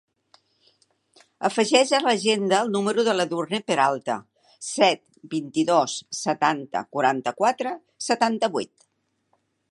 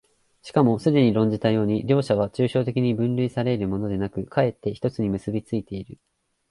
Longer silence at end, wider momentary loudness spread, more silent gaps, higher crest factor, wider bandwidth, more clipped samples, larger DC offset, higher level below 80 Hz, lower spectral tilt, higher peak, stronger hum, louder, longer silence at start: first, 1.05 s vs 0.55 s; about the same, 11 LU vs 9 LU; neither; about the same, 22 dB vs 18 dB; about the same, 11.5 kHz vs 11.5 kHz; neither; neither; second, -76 dBFS vs -52 dBFS; second, -3.5 dB/octave vs -8.5 dB/octave; first, -2 dBFS vs -6 dBFS; neither; about the same, -23 LUFS vs -23 LUFS; first, 1.4 s vs 0.45 s